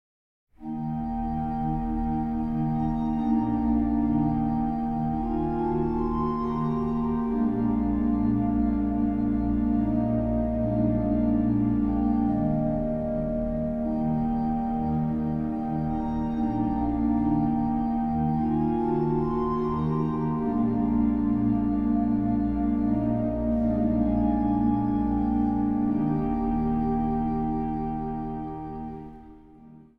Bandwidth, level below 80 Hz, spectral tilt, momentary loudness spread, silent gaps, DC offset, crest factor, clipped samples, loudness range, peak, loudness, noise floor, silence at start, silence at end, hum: 3.9 kHz; -38 dBFS; -11.5 dB/octave; 4 LU; none; 0.3%; 12 dB; under 0.1%; 3 LU; -12 dBFS; -26 LUFS; -50 dBFS; 0.55 s; 0.15 s; none